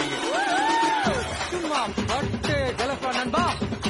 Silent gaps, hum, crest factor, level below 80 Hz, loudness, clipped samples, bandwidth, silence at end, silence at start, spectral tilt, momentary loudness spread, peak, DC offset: none; none; 14 dB; -42 dBFS; -24 LUFS; under 0.1%; 11.5 kHz; 0 s; 0 s; -4 dB/octave; 5 LU; -10 dBFS; under 0.1%